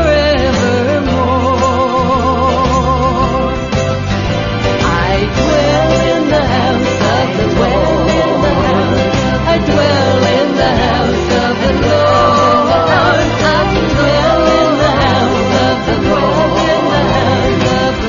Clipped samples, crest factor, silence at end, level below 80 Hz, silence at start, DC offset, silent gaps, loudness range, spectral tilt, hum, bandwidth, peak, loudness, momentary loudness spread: under 0.1%; 12 dB; 0 s; -24 dBFS; 0 s; under 0.1%; none; 3 LU; -5.5 dB/octave; none; 7.4 kHz; 0 dBFS; -12 LUFS; 3 LU